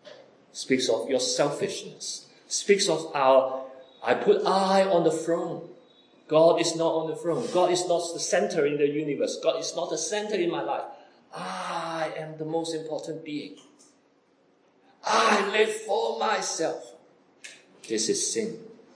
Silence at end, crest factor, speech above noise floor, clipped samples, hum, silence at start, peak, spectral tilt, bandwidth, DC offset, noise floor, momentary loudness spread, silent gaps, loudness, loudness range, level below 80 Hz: 0.25 s; 20 dB; 38 dB; under 0.1%; none; 0.05 s; -6 dBFS; -3 dB/octave; 10.5 kHz; under 0.1%; -64 dBFS; 16 LU; none; -26 LUFS; 9 LU; -86 dBFS